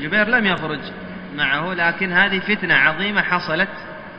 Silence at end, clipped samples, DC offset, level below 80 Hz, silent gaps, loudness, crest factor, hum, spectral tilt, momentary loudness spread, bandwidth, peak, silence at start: 0 s; under 0.1%; under 0.1%; -50 dBFS; none; -18 LUFS; 20 dB; none; -6.5 dB/octave; 14 LU; 6.2 kHz; 0 dBFS; 0 s